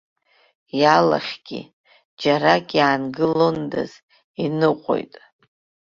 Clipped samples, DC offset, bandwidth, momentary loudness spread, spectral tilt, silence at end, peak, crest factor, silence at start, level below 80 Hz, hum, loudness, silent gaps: under 0.1%; under 0.1%; 7.4 kHz; 16 LU; -6 dB/octave; 0.9 s; -2 dBFS; 20 dB; 0.75 s; -62 dBFS; none; -20 LUFS; 1.73-1.84 s, 2.05-2.17 s, 4.03-4.08 s, 4.24-4.34 s